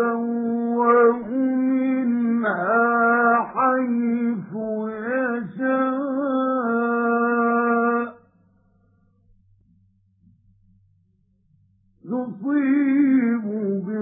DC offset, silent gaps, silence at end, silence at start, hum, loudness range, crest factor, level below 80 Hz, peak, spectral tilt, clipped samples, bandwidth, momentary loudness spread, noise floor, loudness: under 0.1%; none; 0 s; 0 s; none; 9 LU; 16 dB; -70 dBFS; -6 dBFS; -12 dB/octave; under 0.1%; 3.8 kHz; 8 LU; -63 dBFS; -21 LUFS